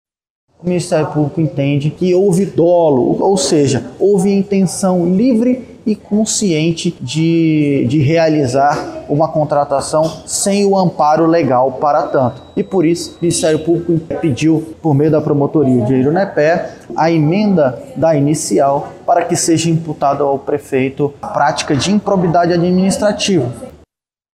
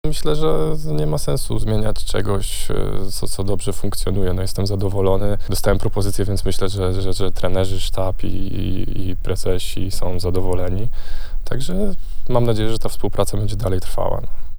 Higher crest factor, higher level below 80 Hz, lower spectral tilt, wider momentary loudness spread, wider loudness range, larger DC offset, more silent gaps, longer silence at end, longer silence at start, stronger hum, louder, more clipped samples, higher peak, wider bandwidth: about the same, 10 dB vs 14 dB; second, -48 dBFS vs -22 dBFS; about the same, -5.5 dB/octave vs -6 dB/octave; about the same, 6 LU vs 6 LU; about the same, 2 LU vs 3 LU; neither; neither; first, 0.7 s vs 0 s; first, 0.65 s vs 0.05 s; neither; first, -14 LUFS vs -23 LUFS; neither; about the same, -2 dBFS vs 0 dBFS; second, 14.5 kHz vs over 20 kHz